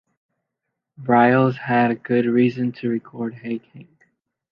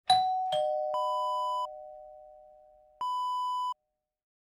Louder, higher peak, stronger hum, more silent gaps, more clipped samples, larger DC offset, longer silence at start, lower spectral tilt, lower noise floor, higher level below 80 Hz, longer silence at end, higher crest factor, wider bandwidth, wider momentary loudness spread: first, -20 LUFS vs -31 LUFS; first, -2 dBFS vs -12 dBFS; neither; neither; neither; neither; first, 1 s vs 0.1 s; first, -9.5 dB/octave vs -1.5 dB/octave; about the same, -81 dBFS vs -83 dBFS; first, -68 dBFS vs -76 dBFS; about the same, 0.7 s vs 0.8 s; about the same, 18 dB vs 22 dB; second, 5.4 kHz vs 18 kHz; second, 15 LU vs 20 LU